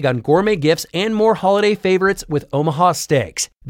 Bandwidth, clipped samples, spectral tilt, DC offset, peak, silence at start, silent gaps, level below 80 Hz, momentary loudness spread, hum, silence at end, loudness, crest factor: 17 kHz; under 0.1%; -5 dB/octave; under 0.1%; -2 dBFS; 0 s; none; -48 dBFS; 5 LU; none; 0 s; -17 LUFS; 14 dB